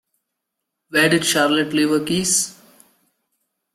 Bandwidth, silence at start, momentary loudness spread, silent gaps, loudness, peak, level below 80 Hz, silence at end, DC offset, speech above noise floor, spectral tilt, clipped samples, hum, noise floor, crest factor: 16 kHz; 0.9 s; 4 LU; none; -18 LUFS; -2 dBFS; -60 dBFS; 1.2 s; under 0.1%; 62 dB; -3 dB/octave; under 0.1%; none; -80 dBFS; 18 dB